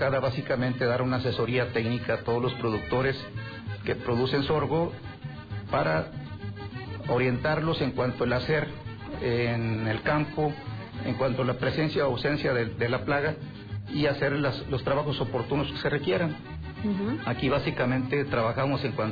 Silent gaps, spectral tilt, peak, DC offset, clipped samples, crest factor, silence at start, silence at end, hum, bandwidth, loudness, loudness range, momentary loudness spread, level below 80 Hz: none; -8.5 dB/octave; -16 dBFS; under 0.1%; under 0.1%; 12 dB; 0 s; 0 s; none; 5 kHz; -28 LUFS; 2 LU; 11 LU; -50 dBFS